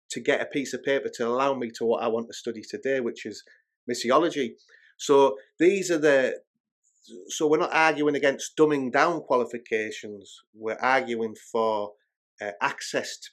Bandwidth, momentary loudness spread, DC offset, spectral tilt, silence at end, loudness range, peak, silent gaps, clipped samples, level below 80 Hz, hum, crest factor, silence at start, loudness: 13.5 kHz; 14 LU; under 0.1%; -4 dB/octave; 0.05 s; 5 LU; -4 dBFS; 3.76-3.87 s, 6.47-6.54 s, 6.60-6.64 s, 6.72-6.82 s, 10.47-10.53 s, 12.16-12.38 s; under 0.1%; -88 dBFS; none; 22 dB; 0.1 s; -25 LUFS